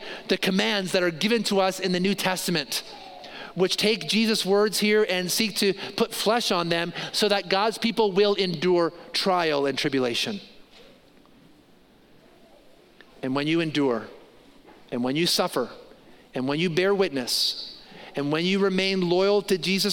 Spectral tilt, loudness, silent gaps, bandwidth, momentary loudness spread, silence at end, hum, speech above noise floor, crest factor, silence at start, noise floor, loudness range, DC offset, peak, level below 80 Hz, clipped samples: -4 dB/octave; -24 LUFS; none; 17 kHz; 10 LU; 0 s; none; 32 dB; 20 dB; 0 s; -56 dBFS; 7 LU; under 0.1%; -6 dBFS; -64 dBFS; under 0.1%